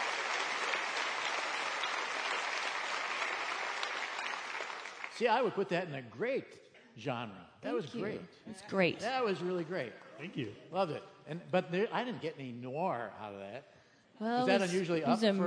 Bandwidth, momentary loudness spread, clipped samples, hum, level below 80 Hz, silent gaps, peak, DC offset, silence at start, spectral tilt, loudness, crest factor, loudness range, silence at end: 10.5 kHz; 14 LU; under 0.1%; none; -82 dBFS; none; -14 dBFS; under 0.1%; 0 s; -4.5 dB/octave; -35 LUFS; 22 dB; 3 LU; 0 s